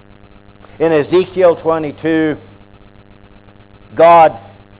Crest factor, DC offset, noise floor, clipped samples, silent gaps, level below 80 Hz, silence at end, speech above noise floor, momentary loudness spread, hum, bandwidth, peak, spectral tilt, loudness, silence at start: 14 dB; under 0.1%; -42 dBFS; under 0.1%; none; -48 dBFS; 0.4 s; 31 dB; 15 LU; none; 4 kHz; 0 dBFS; -10 dB/octave; -12 LUFS; 0.8 s